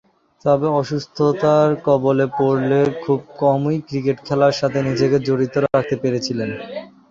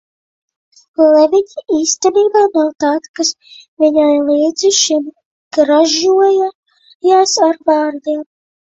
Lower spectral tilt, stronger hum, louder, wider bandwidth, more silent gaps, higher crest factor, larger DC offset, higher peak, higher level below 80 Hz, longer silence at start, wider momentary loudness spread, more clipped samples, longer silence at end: first, -7 dB/octave vs -1 dB/octave; neither; second, -18 LUFS vs -13 LUFS; about the same, 7.6 kHz vs 8.2 kHz; second, none vs 3.09-3.14 s, 3.68-3.77 s, 5.25-5.51 s, 6.55-6.63 s, 6.95-7.00 s; about the same, 16 dB vs 14 dB; neither; about the same, -2 dBFS vs 0 dBFS; about the same, -56 dBFS vs -60 dBFS; second, 0.45 s vs 1 s; about the same, 8 LU vs 10 LU; neither; second, 0.25 s vs 0.4 s